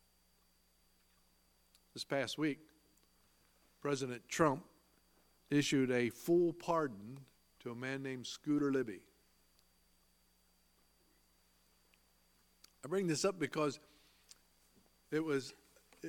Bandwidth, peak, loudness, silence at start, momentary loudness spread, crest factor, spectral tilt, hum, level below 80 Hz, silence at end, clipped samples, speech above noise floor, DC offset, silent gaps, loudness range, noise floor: 17.5 kHz; -16 dBFS; -37 LUFS; 1.95 s; 19 LU; 24 dB; -5 dB/octave; none; -76 dBFS; 0 s; under 0.1%; 37 dB; under 0.1%; none; 9 LU; -74 dBFS